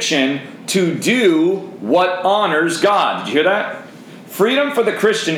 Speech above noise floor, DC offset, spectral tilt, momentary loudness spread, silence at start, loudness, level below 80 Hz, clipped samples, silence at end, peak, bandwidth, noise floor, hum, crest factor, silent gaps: 21 dB; under 0.1%; -4 dB/octave; 7 LU; 0 s; -16 LUFS; -70 dBFS; under 0.1%; 0 s; -2 dBFS; over 20 kHz; -37 dBFS; none; 14 dB; none